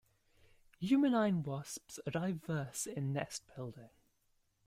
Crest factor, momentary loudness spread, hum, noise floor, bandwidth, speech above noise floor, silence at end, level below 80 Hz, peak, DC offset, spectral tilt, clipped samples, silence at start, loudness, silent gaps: 18 dB; 15 LU; none; -77 dBFS; 16 kHz; 41 dB; 0.8 s; -72 dBFS; -20 dBFS; under 0.1%; -5.5 dB/octave; under 0.1%; 0.8 s; -37 LUFS; none